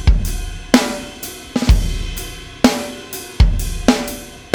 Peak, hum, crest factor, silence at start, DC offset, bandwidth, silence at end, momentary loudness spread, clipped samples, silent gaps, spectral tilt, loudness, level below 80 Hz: 0 dBFS; none; 16 dB; 0 s; under 0.1%; over 20 kHz; 0 s; 13 LU; under 0.1%; none; -5 dB/octave; -19 LUFS; -20 dBFS